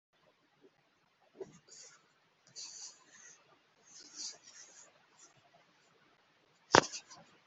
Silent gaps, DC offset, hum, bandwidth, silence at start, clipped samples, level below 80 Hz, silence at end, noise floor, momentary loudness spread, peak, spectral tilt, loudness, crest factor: none; under 0.1%; none; 8.2 kHz; 1.4 s; under 0.1%; -78 dBFS; 0.3 s; -74 dBFS; 29 LU; -2 dBFS; -2.5 dB/octave; -34 LUFS; 38 dB